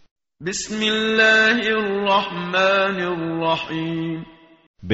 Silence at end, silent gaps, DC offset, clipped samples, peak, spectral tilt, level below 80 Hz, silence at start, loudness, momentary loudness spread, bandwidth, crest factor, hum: 0 s; 4.67-4.74 s; under 0.1%; under 0.1%; -4 dBFS; -2 dB/octave; -56 dBFS; 0.4 s; -19 LUFS; 12 LU; 8 kHz; 16 dB; none